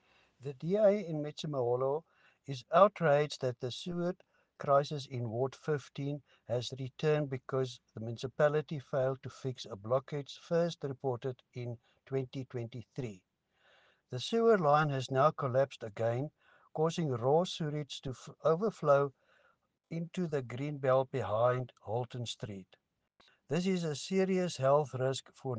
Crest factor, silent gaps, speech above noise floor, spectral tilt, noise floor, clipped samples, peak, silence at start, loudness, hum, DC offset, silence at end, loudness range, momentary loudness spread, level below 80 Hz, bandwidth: 22 dB; none; 40 dB; -6.5 dB/octave; -73 dBFS; under 0.1%; -12 dBFS; 0.4 s; -34 LUFS; none; under 0.1%; 0 s; 6 LU; 14 LU; -72 dBFS; 9.6 kHz